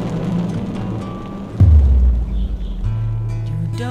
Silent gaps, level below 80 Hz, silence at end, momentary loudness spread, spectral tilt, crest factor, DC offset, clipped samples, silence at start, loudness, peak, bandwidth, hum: none; -20 dBFS; 0 s; 13 LU; -9 dB/octave; 14 dB; under 0.1%; under 0.1%; 0 s; -19 LUFS; -2 dBFS; 6.8 kHz; none